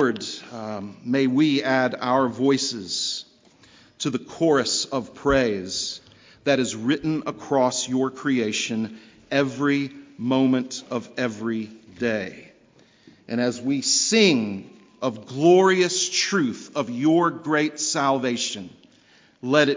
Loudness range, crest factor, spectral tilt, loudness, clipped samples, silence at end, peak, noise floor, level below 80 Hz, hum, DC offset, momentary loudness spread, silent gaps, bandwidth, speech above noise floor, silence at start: 5 LU; 20 dB; -3.5 dB/octave; -23 LUFS; under 0.1%; 0 s; -4 dBFS; -56 dBFS; -56 dBFS; none; under 0.1%; 12 LU; none; 7.8 kHz; 34 dB; 0 s